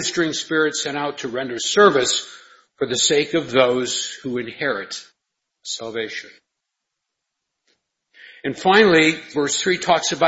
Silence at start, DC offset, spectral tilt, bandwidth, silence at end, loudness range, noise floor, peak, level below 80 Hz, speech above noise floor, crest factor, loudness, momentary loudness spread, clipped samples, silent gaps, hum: 0 s; under 0.1%; -2.5 dB/octave; 8.2 kHz; 0 s; 14 LU; -80 dBFS; 0 dBFS; -62 dBFS; 60 dB; 20 dB; -19 LUFS; 15 LU; under 0.1%; none; none